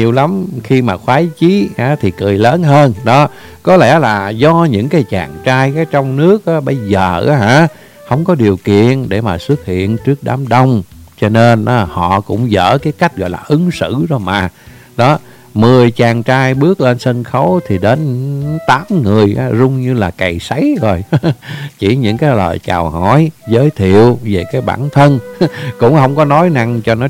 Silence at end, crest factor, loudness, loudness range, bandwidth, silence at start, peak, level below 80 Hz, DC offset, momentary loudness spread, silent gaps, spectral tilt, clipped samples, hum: 0 s; 10 dB; -11 LUFS; 3 LU; 16 kHz; 0 s; 0 dBFS; -40 dBFS; under 0.1%; 7 LU; none; -7.5 dB/octave; 0.6%; none